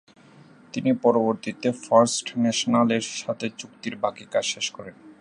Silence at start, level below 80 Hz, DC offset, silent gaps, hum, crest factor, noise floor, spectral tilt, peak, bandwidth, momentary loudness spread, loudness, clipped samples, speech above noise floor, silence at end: 0.75 s; -70 dBFS; under 0.1%; none; none; 20 dB; -51 dBFS; -4 dB/octave; -4 dBFS; 11 kHz; 14 LU; -24 LUFS; under 0.1%; 27 dB; 0.1 s